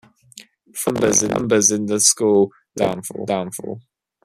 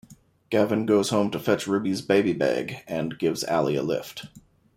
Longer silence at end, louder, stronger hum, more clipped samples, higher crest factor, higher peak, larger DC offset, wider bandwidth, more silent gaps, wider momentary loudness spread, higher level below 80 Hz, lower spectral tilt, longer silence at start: about the same, 0.45 s vs 0.35 s; first, -18 LUFS vs -25 LUFS; neither; neither; about the same, 20 dB vs 18 dB; first, 0 dBFS vs -8 dBFS; neither; second, 14.5 kHz vs 16 kHz; neither; first, 15 LU vs 9 LU; first, -56 dBFS vs -64 dBFS; second, -3 dB/octave vs -5.5 dB/octave; first, 0.35 s vs 0.1 s